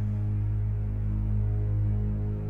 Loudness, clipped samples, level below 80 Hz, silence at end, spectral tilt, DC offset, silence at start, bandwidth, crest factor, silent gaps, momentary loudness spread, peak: -29 LUFS; under 0.1%; -32 dBFS; 0 s; -11.5 dB/octave; under 0.1%; 0 s; 2.6 kHz; 8 dB; none; 2 LU; -18 dBFS